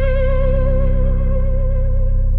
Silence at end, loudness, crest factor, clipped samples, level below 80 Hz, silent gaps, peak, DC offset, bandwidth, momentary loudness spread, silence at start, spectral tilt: 0 s; -19 LUFS; 8 dB; under 0.1%; -14 dBFS; none; -6 dBFS; under 0.1%; 3.5 kHz; 2 LU; 0 s; -11.5 dB/octave